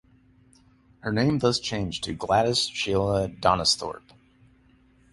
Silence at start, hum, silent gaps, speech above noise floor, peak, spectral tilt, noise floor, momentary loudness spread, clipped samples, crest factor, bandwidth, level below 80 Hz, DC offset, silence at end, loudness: 1.05 s; none; none; 34 dB; -4 dBFS; -4.5 dB/octave; -59 dBFS; 9 LU; under 0.1%; 22 dB; 11.5 kHz; -48 dBFS; under 0.1%; 1.15 s; -24 LUFS